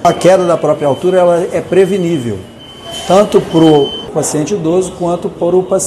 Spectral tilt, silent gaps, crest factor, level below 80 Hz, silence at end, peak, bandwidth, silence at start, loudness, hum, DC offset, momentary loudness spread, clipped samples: -5.5 dB/octave; none; 12 dB; -44 dBFS; 0 s; 0 dBFS; 14 kHz; 0 s; -11 LUFS; none; under 0.1%; 11 LU; 0.8%